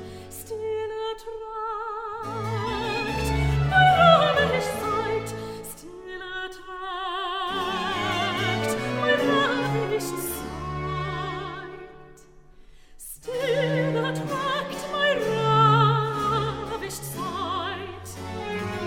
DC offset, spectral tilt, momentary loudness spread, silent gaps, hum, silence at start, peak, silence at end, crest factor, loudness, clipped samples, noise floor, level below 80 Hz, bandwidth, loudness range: under 0.1%; -5 dB/octave; 17 LU; none; none; 0 s; -4 dBFS; 0 s; 22 dB; -25 LUFS; under 0.1%; -49 dBFS; -42 dBFS; 17 kHz; 9 LU